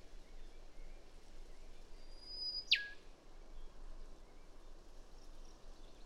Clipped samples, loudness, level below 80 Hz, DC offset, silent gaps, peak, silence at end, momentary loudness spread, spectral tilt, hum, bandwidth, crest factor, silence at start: under 0.1%; -38 LUFS; -54 dBFS; under 0.1%; none; -18 dBFS; 0 s; 28 LU; -1.5 dB/octave; none; 12 kHz; 30 dB; 0 s